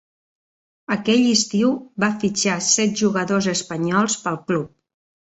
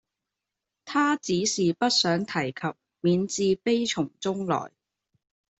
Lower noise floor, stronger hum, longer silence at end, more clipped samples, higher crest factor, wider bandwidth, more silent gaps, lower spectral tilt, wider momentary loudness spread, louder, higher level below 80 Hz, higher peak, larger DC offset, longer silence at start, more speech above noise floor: first, under -90 dBFS vs -86 dBFS; neither; second, 0.6 s vs 0.95 s; neither; about the same, 18 dB vs 18 dB; about the same, 8.2 kHz vs 8.4 kHz; neither; about the same, -3.5 dB/octave vs -4 dB/octave; about the same, 7 LU vs 8 LU; first, -20 LUFS vs -26 LUFS; first, -60 dBFS vs -66 dBFS; first, -4 dBFS vs -10 dBFS; neither; about the same, 0.9 s vs 0.85 s; first, over 70 dB vs 61 dB